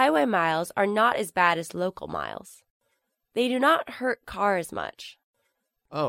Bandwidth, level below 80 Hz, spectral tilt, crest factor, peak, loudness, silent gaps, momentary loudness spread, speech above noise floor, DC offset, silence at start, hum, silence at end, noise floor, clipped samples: 16 kHz; -62 dBFS; -4.5 dB/octave; 20 dB; -6 dBFS; -25 LUFS; 2.70-2.80 s, 5.24-5.34 s; 14 LU; 51 dB; under 0.1%; 0 s; none; 0 s; -76 dBFS; under 0.1%